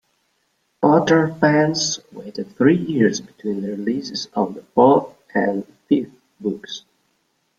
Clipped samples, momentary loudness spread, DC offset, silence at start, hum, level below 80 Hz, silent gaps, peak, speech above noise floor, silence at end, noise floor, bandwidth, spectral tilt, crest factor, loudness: under 0.1%; 15 LU; under 0.1%; 0.8 s; none; -62 dBFS; none; -2 dBFS; 49 dB; 0.8 s; -68 dBFS; 7.8 kHz; -5 dB/octave; 18 dB; -19 LUFS